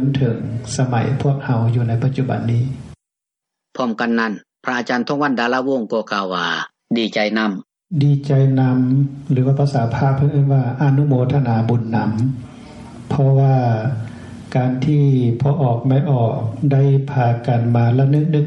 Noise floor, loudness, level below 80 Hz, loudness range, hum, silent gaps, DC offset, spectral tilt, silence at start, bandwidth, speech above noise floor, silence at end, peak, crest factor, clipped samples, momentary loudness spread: -83 dBFS; -18 LUFS; -54 dBFS; 4 LU; none; none; under 0.1%; -7.5 dB/octave; 0 s; 8.8 kHz; 67 dB; 0 s; -4 dBFS; 14 dB; under 0.1%; 9 LU